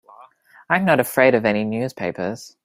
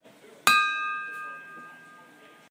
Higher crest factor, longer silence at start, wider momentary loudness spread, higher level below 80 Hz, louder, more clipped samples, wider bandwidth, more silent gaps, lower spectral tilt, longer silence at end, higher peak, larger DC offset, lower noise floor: second, 20 dB vs 30 dB; second, 0.2 s vs 0.45 s; second, 11 LU vs 24 LU; first, -60 dBFS vs -80 dBFS; first, -19 LUFS vs -24 LUFS; neither; about the same, 16 kHz vs 16 kHz; neither; first, -5.5 dB/octave vs 0.5 dB/octave; second, 0.15 s vs 0.5 s; about the same, 0 dBFS vs 0 dBFS; neither; second, -49 dBFS vs -53 dBFS